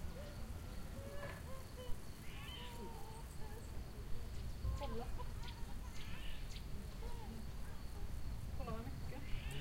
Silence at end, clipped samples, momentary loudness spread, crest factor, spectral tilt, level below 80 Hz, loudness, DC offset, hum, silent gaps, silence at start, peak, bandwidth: 0 s; under 0.1%; 5 LU; 16 dB; -5.5 dB/octave; -48 dBFS; -50 LUFS; under 0.1%; none; none; 0 s; -28 dBFS; 16 kHz